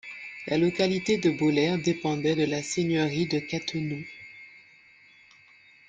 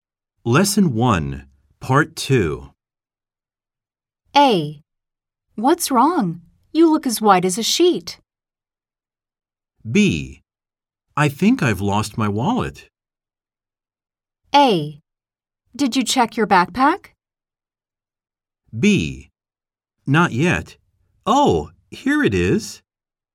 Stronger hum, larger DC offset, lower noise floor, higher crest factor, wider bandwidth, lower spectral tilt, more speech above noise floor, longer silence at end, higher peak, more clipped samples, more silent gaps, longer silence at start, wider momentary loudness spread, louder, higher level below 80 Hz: neither; neither; second, -56 dBFS vs under -90 dBFS; about the same, 18 dB vs 20 dB; second, 9.4 kHz vs 16.5 kHz; about the same, -5.5 dB/octave vs -5 dB/octave; second, 30 dB vs over 73 dB; first, 1.3 s vs 0.6 s; second, -10 dBFS vs 0 dBFS; neither; neither; second, 0.05 s vs 0.45 s; about the same, 15 LU vs 15 LU; second, -27 LUFS vs -18 LUFS; second, -64 dBFS vs -46 dBFS